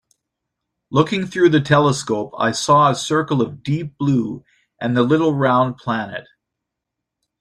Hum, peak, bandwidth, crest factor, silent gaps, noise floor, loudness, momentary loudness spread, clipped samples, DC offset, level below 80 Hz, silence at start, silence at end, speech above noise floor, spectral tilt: none; -2 dBFS; 12 kHz; 18 dB; none; -81 dBFS; -18 LUFS; 10 LU; under 0.1%; under 0.1%; -56 dBFS; 0.9 s; 1.2 s; 64 dB; -6 dB/octave